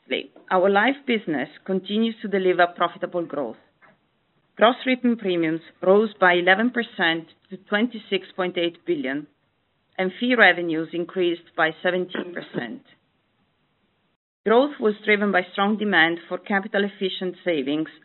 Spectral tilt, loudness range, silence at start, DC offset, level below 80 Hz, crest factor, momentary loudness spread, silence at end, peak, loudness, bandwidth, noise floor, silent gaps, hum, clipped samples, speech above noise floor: -2.5 dB/octave; 6 LU; 0.1 s; under 0.1%; -76 dBFS; 22 dB; 12 LU; 0.15 s; -2 dBFS; -22 LUFS; 4.2 kHz; -69 dBFS; 14.16-14.44 s; none; under 0.1%; 47 dB